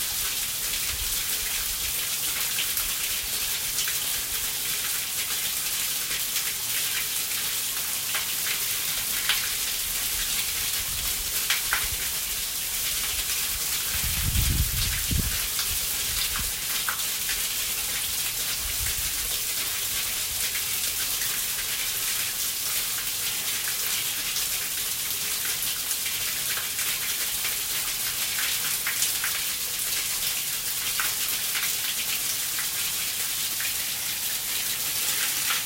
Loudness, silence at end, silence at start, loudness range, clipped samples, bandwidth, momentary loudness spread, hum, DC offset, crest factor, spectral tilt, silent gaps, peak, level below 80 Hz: -25 LUFS; 0 s; 0 s; 1 LU; under 0.1%; 16.5 kHz; 2 LU; none; under 0.1%; 22 dB; 0 dB/octave; none; -6 dBFS; -44 dBFS